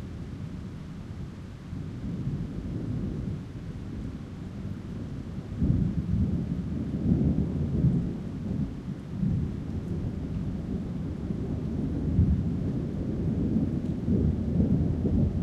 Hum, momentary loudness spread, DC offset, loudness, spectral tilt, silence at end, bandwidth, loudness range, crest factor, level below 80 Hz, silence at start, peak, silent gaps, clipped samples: none; 13 LU; under 0.1%; -30 LUFS; -10 dB/octave; 0 s; 8.4 kHz; 8 LU; 18 dB; -38 dBFS; 0 s; -10 dBFS; none; under 0.1%